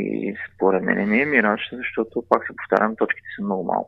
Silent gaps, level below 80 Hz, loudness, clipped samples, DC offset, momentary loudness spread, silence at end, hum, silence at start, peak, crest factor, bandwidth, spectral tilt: none; -62 dBFS; -22 LUFS; under 0.1%; under 0.1%; 9 LU; 0 s; none; 0 s; 0 dBFS; 22 dB; 6 kHz; -8 dB/octave